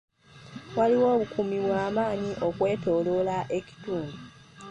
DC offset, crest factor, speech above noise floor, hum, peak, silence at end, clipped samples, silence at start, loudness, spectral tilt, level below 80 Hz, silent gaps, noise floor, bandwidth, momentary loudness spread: under 0.1%; 16 dB; 20 dB; none; -12 dBFS; 0 s; under 0.1%; 0.35 s; -27 LUFS; -7 dB/octave; -60 dBFS; none; -46 dBFS; 9 kHz; 17 LU